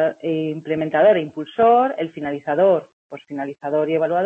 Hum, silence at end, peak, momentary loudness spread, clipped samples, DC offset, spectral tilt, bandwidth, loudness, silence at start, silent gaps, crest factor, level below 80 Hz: none; 0 s; -4 dBFS; 14 LU; under 0.1%; under 0.1%; -8 dB/octave; 4.2 kHz; -19 LUFS; 0 s; 2.93-3.10 s; 14 dB; -64 dBFS